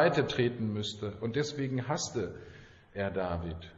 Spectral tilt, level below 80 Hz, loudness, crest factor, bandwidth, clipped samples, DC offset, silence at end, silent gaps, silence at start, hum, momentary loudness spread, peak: -5 dB/octave; -56 dBFS; -33 LUFS; 20 dB; 8 kHz; under 0.1%; under 0.1%; 0 s; none; 0 s; none; 10 LU; -14 dBFS